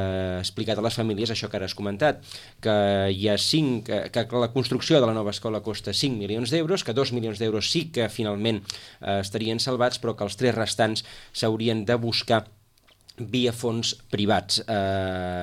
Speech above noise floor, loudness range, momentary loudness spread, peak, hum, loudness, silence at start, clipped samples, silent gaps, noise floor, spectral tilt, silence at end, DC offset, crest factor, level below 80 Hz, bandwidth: 34 dB; 3 LU; 7 LU; -6 dBFS; none; -25 LUFS; 0 s; under 0.1%; none; -59 dBFS; -5 dB/octave; 0 s; under 0.1%; 18 dB; -58 dBFS; 15.5 kHz